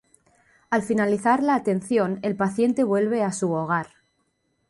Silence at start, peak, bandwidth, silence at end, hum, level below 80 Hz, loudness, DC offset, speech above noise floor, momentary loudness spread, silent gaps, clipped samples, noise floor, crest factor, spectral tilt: 0.7 s; -8 dBFS; 11.5 kHz; 0.85 s; none; -64 dBFS; -23 LUFS; under 0.1%; 49 dB; 6 LU; none; under 0.1%; -71 dBFS; 16 dB; -6.5 dB/octave